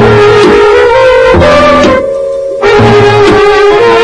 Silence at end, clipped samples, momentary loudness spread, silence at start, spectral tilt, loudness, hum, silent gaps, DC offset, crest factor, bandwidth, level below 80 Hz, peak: 0 s; 8%; 6 LU; 0 s; -5.5 dB/octave; -4 LUFS; none; none; under 0.1%; 4 dB; 10.5 kHz; -26 dBFS; 0 dBFS